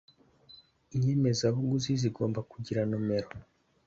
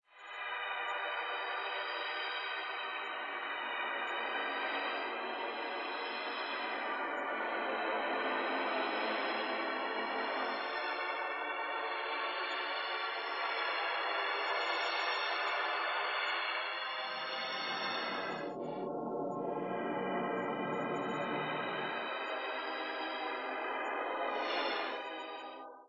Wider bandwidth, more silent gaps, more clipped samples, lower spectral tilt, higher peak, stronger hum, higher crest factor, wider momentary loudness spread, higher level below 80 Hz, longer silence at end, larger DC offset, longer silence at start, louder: about the same, 7.8 kHz vs 8.2 kHz; neither; neither; first, -6.5 dB/octave vs -4.5 dB/octave; first, -14 dBFS vs -22 dBFS; neither; about the same, 16 dB vs 16 dB; first, 10 LU vs 5 LU; first, -60 dBFS vs -86 dBFS; first, 0.45 s vs 0 s; neither; first, 0.5 s vs 0.15 s; first, -31 LUFS vs -36 LUFS